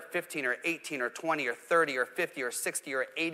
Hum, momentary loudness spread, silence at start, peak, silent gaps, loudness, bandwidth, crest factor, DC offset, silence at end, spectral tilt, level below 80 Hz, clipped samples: none; 6 LU; 0 s; -14 dBFS; none; -31 LUFS; 16 kHz; 18 dB; under 0.1%; 0 s; -2.5 dB/octave; -84 dBFS; under 0.1%